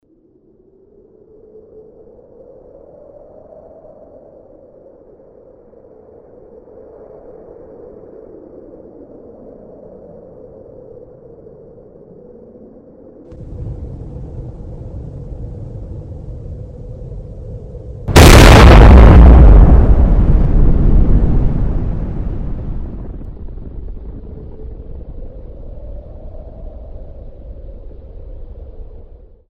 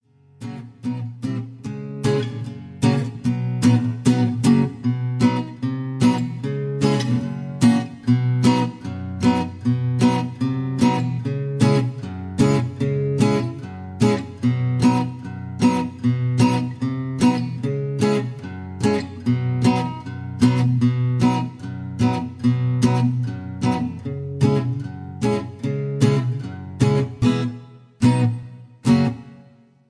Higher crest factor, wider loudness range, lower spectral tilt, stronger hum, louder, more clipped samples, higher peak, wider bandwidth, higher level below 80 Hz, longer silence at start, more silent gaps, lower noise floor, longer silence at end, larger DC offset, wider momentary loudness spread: about the same, 14 dB vs 18 dB; first, 28 LU vs 2 LU; second, -6 dB/octave vs -7.5 dB/octave; neither; first, -9 LUFS vs -21 LUFS; first, 0.5% vs under 0.1%; first, 0 dBFS vs -4 dBFS; first, 16 kHz vs 11 kHz; first, -16 dBFS vs -52 dBFS; first, 13.6 s vs 0.4 s; neither; about the same, -51 dBFS vs -50 dBFS; first, 0.7 s vs 0.45 s; neither; first, 31 LU vs 12 LU